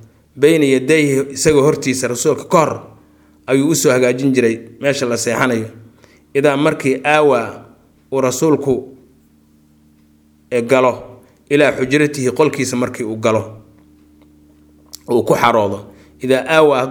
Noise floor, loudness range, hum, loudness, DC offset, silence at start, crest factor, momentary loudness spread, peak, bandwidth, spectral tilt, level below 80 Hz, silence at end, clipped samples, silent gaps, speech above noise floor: -51 dBFS; 4 LU; none; -15 LUFS; under 0.1%; 0.35 s; 16 dB; 9 LU; 0 dBFS; 18.5 kHz; -5 dB/octave; -52 dBFS; 0 s; under 0.1%; none; 37 dB